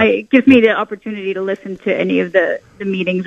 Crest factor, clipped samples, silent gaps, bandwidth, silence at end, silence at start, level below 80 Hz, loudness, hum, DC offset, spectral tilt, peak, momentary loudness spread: 14 dB; under 0.1%; none; 7 kHz; 0 s; 0 s; -54 dBFS; -15 LUFS; none; under 0.1%; -7.5 dB/octave; 0 dBFS; 13 LU